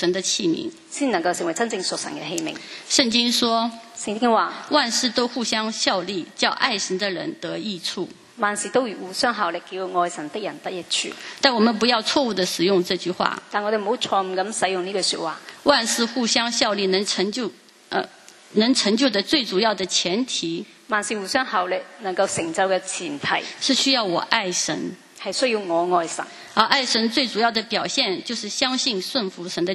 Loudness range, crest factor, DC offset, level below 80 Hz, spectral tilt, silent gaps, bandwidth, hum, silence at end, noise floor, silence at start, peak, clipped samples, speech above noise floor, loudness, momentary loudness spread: 3 LU; 22 dB; under 0.1%; -66 dBFS; -2.5 dB/octave; none; 13 kHz; none; 0 s; -42 dBFS; 0 s; 0 dBFS; under 0.1%; 20 dB; -22 LUFS; 10 LU